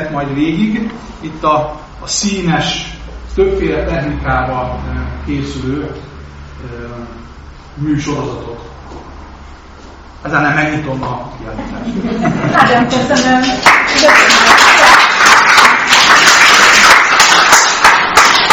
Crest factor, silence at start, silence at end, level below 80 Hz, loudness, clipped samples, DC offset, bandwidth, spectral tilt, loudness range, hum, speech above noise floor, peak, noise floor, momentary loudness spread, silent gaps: 12 dB; 0 s; 0 s; -30 dBFS; -8 LUFS; 2%; 0.2%; over 20 kHz; -2.5 dB/octave; 19 LU; none; 20 dB; 0 dBFS; -34 dBFS; 22 LU; none